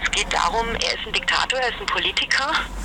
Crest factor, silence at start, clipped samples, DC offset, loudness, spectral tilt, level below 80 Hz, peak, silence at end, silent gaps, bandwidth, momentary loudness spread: 18 dB; 0 s; under 0.1%; under 0.1%; -21 LUFS; -1.5 dB/octave; -36 dBFS; -4 dBFS; 0 s; none; 18 kHz; 3 LU